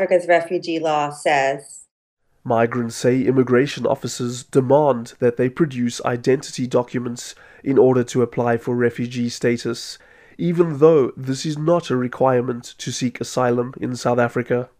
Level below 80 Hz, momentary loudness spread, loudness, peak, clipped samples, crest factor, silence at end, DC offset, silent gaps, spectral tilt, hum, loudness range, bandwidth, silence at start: -60 dBFS; 10 LU; -20 LUFS; -2 dBFS; under 0.1%; 18 dB; 0.15 s; under 0.1%; 1.91-2.17 s; -6 dB/octave; none; 2 LU; 15.5 kHz; 0 s